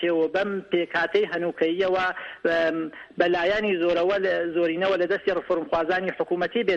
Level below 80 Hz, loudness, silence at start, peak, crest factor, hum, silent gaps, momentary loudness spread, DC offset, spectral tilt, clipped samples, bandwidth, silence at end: -58 dBFS; -24 LUFS; 0 s; -6 dBFS; 18 dB; none; none; 4 LU; under 0.1%; -6 dB/octave; under 0.1%; 7.6 kHz; 0 s